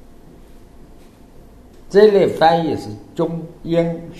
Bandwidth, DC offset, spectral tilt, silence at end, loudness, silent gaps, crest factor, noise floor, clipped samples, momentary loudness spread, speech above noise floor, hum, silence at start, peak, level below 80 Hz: 13 kHz; under 0.1%; -7 dB/octave; 0 s; -16 LUFS; none; 18 dB; -43 dBFS; under 0.1%; 14 LU; 27 dB; none; 1.9 s; 0 dBFS; -44 dBFS